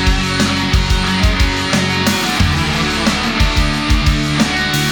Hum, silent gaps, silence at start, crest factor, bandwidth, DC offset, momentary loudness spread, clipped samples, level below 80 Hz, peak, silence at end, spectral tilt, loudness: none; none; 0 s; 14 dB; over 20 kHz; under 0.1%; 1 LU; under 0.1%; -20 dBFS; 0 dBFS; 0 s; -4 dB/octave; -14 LUFS